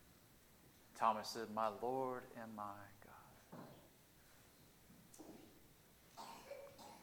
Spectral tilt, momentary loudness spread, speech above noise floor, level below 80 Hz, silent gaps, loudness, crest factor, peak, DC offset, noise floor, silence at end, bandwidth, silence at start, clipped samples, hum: -4 dB/octave; 25 LU; 24 dB; -78 dBFS; none; -45 LUFS; 26 dB; -22 dBFS; under 0.1%; -68 dBFS; 0 s; 19 kHz; 0 s; under 0.1%; none